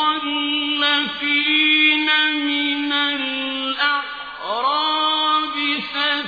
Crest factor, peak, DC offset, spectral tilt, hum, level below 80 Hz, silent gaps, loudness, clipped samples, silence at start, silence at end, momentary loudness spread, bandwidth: 14 dB; -4 dBFS; under 0.1%; -3.5 dB/octave; none; -62 dBFS; none; -18 LUFS; under 0.1%; 0 s; 0 s; 8 LU; 5 kHz